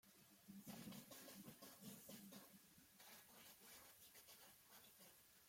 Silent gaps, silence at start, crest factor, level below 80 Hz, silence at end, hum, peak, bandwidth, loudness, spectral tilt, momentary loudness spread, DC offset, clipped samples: none; 0.05 s; 18 dB; under -90 dBFS; 0 s; none; -44 dBFS; 16.5 kHz; -62 LUFS; -3 dB/octave; 8 LU; under 0.1%; under 0.1%